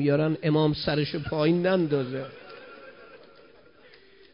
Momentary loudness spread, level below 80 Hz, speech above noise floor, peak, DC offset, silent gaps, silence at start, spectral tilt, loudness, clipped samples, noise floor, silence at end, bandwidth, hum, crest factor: 21 LU; -56 dBFS; 30 dB; -12 dBFS; under 0.1%; none; 0 s; -11 dB/octave; -25 LUFS; under 0.1%; -55 dBFS; 1.2 s; 5.4 kHz; none; 16 dB